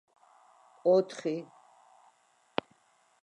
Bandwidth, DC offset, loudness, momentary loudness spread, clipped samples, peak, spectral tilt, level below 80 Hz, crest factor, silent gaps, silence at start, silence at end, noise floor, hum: 10.5 kHz; under 0.1%; -31 LUFS; 13 LU; under 0.1%; -12 dBFS; -6 dB/octave; -84 dBFS; 24 dB; none; 0.85 s; 1.8 s; -68 dBFS; none